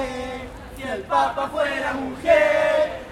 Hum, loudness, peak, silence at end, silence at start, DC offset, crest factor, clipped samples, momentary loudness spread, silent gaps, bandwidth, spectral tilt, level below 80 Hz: none; -21 LUFS; -4 dBFS; 0 s; 0 s; under 0.1%; 18 dB; under 0.1%; 16 LU; none; 14 kHz; -4.5 dB/octave; -46 dBFS